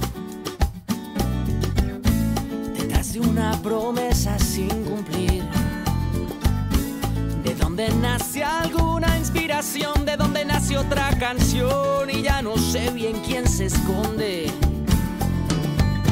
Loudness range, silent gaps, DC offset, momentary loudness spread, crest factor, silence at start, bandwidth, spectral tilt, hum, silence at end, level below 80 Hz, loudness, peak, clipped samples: 2 LU; none; under 0.1%; 5 LU; 14 dB; 0 s; 16 kHz; -5 dB/octave; none; 0 s; -28 dBFS; -23 LUFS; -8 dBFS; under 0.1%